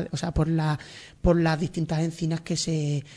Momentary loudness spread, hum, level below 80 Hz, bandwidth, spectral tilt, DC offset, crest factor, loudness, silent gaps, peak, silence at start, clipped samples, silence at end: 6 LU; none; -38 dBFS; 10.5 kHz; -6 dB/octave; under 0.1%; 18 dB; -26 LUFS; none; -8 dBFS; 0 s; under 0.1%; 0 s